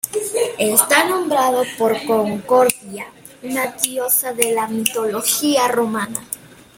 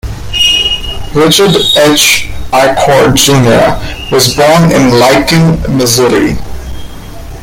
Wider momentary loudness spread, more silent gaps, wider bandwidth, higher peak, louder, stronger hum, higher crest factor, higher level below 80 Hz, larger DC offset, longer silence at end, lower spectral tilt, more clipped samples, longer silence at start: about the same, 14 LU vs 15 LU; neither; second, 17 kHz vs over 20 kHz; about the same, 0 dBFS vs 0 dBFS; second, -17 LUFS vs -7 LUFS; neither; first, 18 dB vs 8 dB; second, -60 dBFS vs -24 dBFS; neither; first, 0.4 s vs 0 s; second, -2 dB/octave vs -4 dB/octave; second, under 0.1% vs 0.4%; about the same, 0.05 s vs 0.05 s